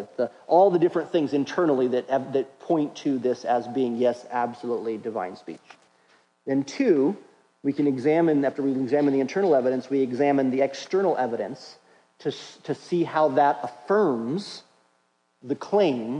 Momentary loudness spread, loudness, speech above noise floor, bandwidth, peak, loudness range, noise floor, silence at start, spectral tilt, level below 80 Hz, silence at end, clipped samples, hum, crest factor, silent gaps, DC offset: 12 LU; -24 LUFS; 45 dB; 10 kHz; -6 dBFS; 5 LU; -69 dBFS; 0 s; -6.5 dB/octave; -78 dBFS; 0 s; under 0.1%; none; 18 dB; none; under 0.1%